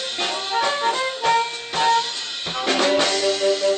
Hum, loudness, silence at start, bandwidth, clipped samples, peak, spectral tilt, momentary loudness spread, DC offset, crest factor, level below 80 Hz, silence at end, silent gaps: none; -20 LUFS; 0 s; 9.2 kHz; under 0.1%; -8 dBFS; -1 dB/octave; 6 LU; under 0.1%; 14 dB; -62 dBFS; 0 s; none